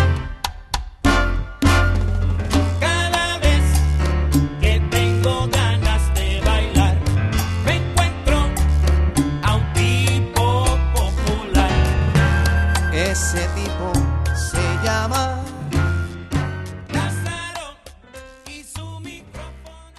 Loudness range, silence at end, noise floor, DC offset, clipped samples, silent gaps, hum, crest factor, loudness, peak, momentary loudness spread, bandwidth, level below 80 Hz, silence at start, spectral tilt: 7 LU; 0.15 s; -41 dBFS; under 0.1%; under 0.1%; none; none; 14 dB; -19 LUFS; -4 dBFS; 11 LU; 12.5 kHz; -22 dBFS; 0 s; -5 dB/octave